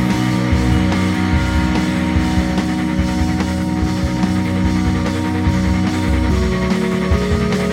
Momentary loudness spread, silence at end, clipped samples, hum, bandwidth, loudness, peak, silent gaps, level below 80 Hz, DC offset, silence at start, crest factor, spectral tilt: 2 LU; 0 s; under 0.1%; none; 15.5 kHz; -17 LUFS; -4 dBFS; none; -24 dBFS; under 0.1%; 0 s; 12 dB; -6.5 dB/octave